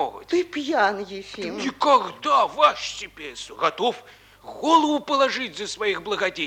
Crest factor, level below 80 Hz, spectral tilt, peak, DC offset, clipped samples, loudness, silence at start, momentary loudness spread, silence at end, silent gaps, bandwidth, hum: 18 dB; -60 dBFS; -3 dB/octave; -4 dBFS; under 0.1%; under 0.1%; -22 LUFS; 0 s; 15 LU; 0 s; none; 17 kHz; none